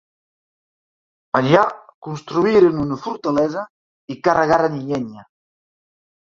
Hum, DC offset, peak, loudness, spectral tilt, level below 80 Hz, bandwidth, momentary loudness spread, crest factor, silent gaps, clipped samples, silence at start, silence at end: none; under 0.1%; -2 dBFS; -18 LUFS; -7 dB/octave; -54 dBFS; 7.4 kHz; 17 LU; 18 dB; 1.94-2.02 s, 3.70-4.08 s; under 0.1%; 1.35 s; 1 s